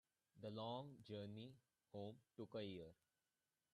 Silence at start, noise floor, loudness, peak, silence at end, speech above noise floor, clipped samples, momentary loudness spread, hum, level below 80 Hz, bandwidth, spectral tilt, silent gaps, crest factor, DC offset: 0.35 s; under -90 dBFS; -55 LUFS; -38 dBFS; 0.8 s; over 36 dB; under 0.1%; 9 LU; none; -88 dBFS; 12 kHz; -7.5 dB/octave; none; 18 dB; under 0.1%